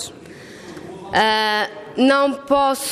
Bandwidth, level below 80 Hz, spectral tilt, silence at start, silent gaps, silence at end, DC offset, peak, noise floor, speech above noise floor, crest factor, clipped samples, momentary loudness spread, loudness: 15.5 kHz; -56 dBFS; -3 dB/octave; 0 s; none; 0 s; under 0.1%; -4 dBFS; -39 dBFS; 22 dB; 16 dB; under 0.1%; 21 LU; -18 LUFS